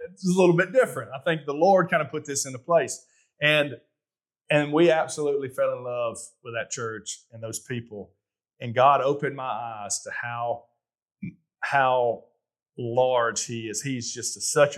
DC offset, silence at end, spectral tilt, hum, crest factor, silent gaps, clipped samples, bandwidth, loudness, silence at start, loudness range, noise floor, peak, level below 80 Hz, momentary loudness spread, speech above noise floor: under 0.1%; 0 s; -4 dB/octave; none; 20 dB; 11.02-11.06 s; under 0.1%; 14 kHz; -25 LUFS; 0 s; 5 LU; under -90 dBFS; -6 dBFS; -78 dBFS; 16 LU; over 65 dB